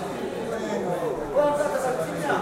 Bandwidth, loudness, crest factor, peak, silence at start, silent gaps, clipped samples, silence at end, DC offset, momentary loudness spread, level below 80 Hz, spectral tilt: 16 kHz; -26 LUFS; 16 dB; -10 dBFS; 0 s; none; under 0.1%; 0 s; under 0.1%; 7 LU; -52 dBFS; -5 dB/octave